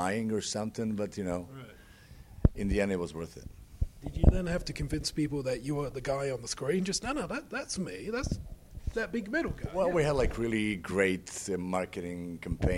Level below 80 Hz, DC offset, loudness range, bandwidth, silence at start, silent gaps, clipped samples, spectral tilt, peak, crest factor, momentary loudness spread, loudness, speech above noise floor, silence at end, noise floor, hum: -38 dBFS; under 0.1%; 3 LU; 16 kHz; 0 s; none; under 0.1%; -5.5 dB/octave; -6 dBFS; 26 dB; 11 LU; -33 LUFS; 21 dB; 0 s; -53 dBFS; none